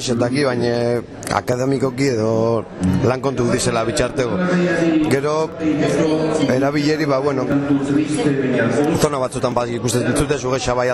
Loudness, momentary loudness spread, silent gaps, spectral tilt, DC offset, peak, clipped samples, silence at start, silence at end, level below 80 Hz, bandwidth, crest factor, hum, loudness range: -18 LUFS; 3 LU; none; -5.5 dB/octave; under 0.1%; -4 dBFS; under 0.1%; 0 s; 0 s; -42 dBFS; 13.5 kHz; 14 dB; none; 1 LU